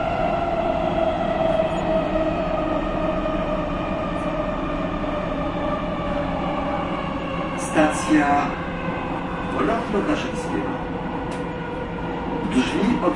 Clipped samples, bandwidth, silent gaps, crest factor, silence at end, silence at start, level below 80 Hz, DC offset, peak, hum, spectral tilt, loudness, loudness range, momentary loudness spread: under 0.1%; 11.5 kHz; none; 18 dB; 0 s; 0 s; -36 dBFS; under 0.1%; -4 dBFS; none; -6 dB/octave; -23 LUFS; 3 LU; 7 LU